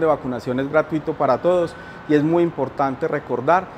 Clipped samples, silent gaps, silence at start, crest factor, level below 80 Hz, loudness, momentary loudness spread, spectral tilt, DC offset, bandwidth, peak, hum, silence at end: under 0.1%; none; 0 s; 18 dB; -54 dBFS; -21 LUFS; 7 LU; -8 dB/octave; under 0.1%; 9.6 kHz; -2 dBFS; none; 0 s